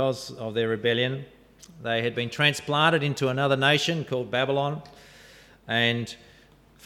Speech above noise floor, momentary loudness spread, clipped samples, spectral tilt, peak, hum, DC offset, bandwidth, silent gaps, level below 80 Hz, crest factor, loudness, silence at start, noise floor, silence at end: 30 dB; 11 LU; under 0.1%; -4.5 dB/octave; -6 dBFS; none; under 0.1%; 15.5 kHz; none; -62 dBFS; 20 dB; -25 LUFS; 0 s; -55 dBFS; 0.7 s